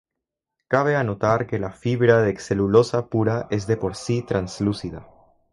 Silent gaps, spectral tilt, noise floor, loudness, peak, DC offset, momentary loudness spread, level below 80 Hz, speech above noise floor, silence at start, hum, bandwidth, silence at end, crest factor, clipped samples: none; -7 dB/octave; -84 dBFS; -22 LUFS; -2 dBFS; under 0.1%; 9 LU; -48 dBFS; 63 dB; 0.7 s; none; 11.5 kHz; 0.5 s; 20 dB; under 0.1%